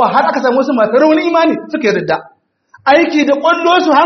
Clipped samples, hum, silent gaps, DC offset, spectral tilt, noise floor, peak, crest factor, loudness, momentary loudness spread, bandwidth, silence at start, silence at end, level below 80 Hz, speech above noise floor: under 0.1%; none; none; under 0.1%; -5 dB/octave; -48 dBFS; 0 dBFS; 12 dB; -12 LUFS; 6 LU; 6.4 kHz; 0 s; 0 s; -60 dBFS; 37 dB